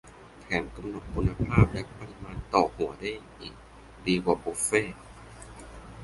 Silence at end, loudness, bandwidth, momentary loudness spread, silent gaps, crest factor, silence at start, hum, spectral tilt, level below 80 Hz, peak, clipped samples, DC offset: 0 s; -28 LUFS; 12 kHz; 21 LU; none; 24 dB; 0.05 s; none; -5.5 dB/octave; -42 dBFS; -6 dBFS; under 0.1%; under 0.1%